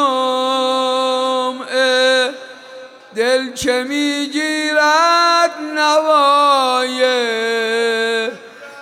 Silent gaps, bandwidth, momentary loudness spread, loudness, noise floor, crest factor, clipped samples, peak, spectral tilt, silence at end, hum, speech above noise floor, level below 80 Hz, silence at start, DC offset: none; 16 kHz; 9 LU; -15 LUFS; -37 dBFS; 12 dB; under 0.1%; -4 dBFS; -1.5 dB/octave; 0 s; none; 22 dB; -58 dBFS; 0 s; under 0.1%